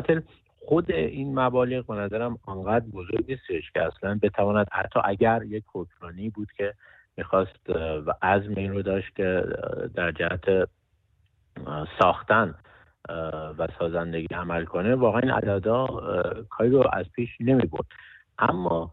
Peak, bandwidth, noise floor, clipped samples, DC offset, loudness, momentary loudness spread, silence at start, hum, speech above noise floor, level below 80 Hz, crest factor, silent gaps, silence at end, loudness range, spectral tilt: -6 dBFS; 4.4 kHz; -66 dBFS; under 0.1%; under 0.1%; -26 LUFS; 12 LU; 0 s; none; 41 dB; -50 dBFS; 20 dB; none; 0 s; 4 LU; -9.5 dB/octave